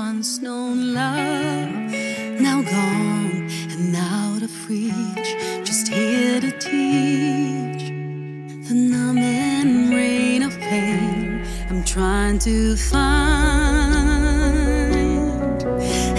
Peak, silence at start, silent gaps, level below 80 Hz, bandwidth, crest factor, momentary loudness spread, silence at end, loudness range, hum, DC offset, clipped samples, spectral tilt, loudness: -4 dBFS; 0 s; none; -26 dBFS; 12 kHz; 16 dB; 8 LU; 0 s; 4 LU; none; under 0.1%; under 0.1%; -5 dB/octave; -20 LUFS